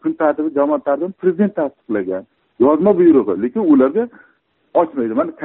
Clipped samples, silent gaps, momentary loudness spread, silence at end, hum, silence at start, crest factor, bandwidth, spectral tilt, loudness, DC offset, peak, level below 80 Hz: under 0.1%; none; 10 LU; 0 s; none; 0.05 s; 14 dB; 3.9 kHz; -8 dB/octave; -16 LUFS; under 0.1%; -2 dBFS; -58 dBFS